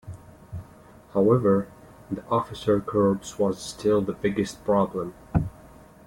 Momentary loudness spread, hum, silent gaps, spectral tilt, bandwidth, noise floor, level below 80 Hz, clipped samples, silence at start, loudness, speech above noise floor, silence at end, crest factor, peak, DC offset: 20 LU; none; none; -7 dB/octave; 17 kHz; -50 dBFS; -48 dBFS; under 0.1%; 0.05 s; -25 LUFS; 26 dB; 0.4 s; 18 dB; -8 dBFS; under 0.1%